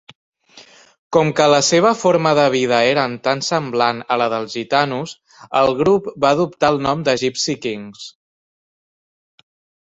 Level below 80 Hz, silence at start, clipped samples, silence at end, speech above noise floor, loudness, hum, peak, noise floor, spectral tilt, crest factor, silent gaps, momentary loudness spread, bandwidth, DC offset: -56 dBFS; 0.55 s; under 0.1%; 1.7 s; 29 dB; -17 LUFS; none; -2 dBFS; -46 dBFS; -4 dB/octave; 16 dB; 0.99-1.10 s; 10 LU; 8.2 kHz; under 0.1%